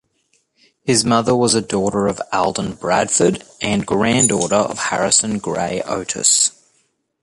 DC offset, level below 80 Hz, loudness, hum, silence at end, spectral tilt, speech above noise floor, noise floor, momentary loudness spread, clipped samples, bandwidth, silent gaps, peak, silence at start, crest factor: under 0.1%; -48 dBFS; -17 LUFS; none; 0.75 s; -3 dB/octave; 47 dB; -64 dBFS; 8 LU; under 0.1%; 11.5 kHz; none; 0 dBFS; 0.85 s; 18 dB